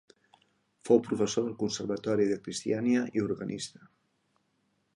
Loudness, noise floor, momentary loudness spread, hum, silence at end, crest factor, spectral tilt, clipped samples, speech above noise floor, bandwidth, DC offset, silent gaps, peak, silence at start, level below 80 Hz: -30 LUFS; -75 dBFS; 11 LU; none; 1.25 s; 22 dB; -5 dB/octave; under 0.1%; 46 dB; 11.5 kHz; under 0.1%; none; -10 dBFS; 0.85 s; -68 dBFS